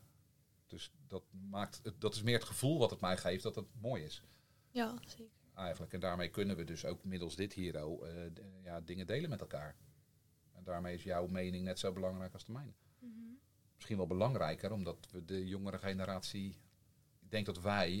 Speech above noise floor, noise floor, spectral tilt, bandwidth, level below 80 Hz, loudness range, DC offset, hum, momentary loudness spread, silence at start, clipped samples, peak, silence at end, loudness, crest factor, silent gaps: 31 dB; -72 dBFS; -5.5 dB/octave; 17 kHz; -66 dBFS; 6 LU; under 0.1%; none; 17 LU; 0 s; under 0.1%; -16 dBFS; 0 s; -41 LUFS; 26 dB; none